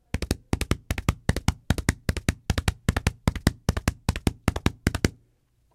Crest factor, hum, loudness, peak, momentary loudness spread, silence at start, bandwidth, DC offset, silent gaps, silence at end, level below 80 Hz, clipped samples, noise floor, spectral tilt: 26 dB; none; -28 LUFS; 0 dBFS; 3 LU; 0.15 s; 16.5 kHz; under 0.1%; none; 0.65 s; -32 dBFS; under 0.1%; -66 dBFS; -5 dB/octave